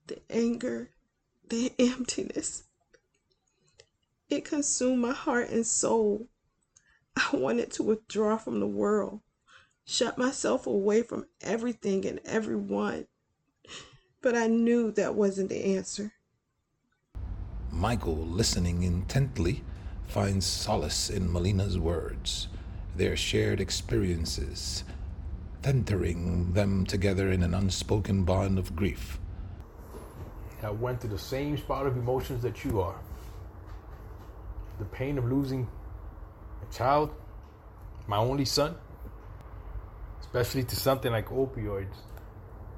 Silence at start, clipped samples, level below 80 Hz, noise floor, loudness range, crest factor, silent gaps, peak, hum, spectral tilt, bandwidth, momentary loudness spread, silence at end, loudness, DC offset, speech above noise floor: 0.1 s; under 0.1%; -44 dBFS; -78 dBFS; 5 LU; 18 dB; none; -12 dBFS; none; -5 dB/octave; 17.5 kHz; 19 LU; 0 s; -30 LUFS; under 0.1%; 49 dB